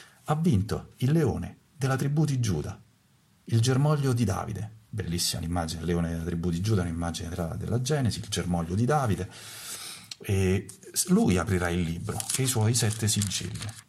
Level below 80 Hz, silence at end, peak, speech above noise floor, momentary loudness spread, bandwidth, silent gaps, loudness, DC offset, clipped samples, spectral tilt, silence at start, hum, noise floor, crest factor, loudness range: -48 dBFS; 0.1 s; -10 dBFS; 36 dB; 12 LU; 15.5 kHz; none; -28 LUFS; under 0.1%; under 0.1%; -5 dB/octave; 0 s; none; -63 dBFS; 18 dB; 3 LU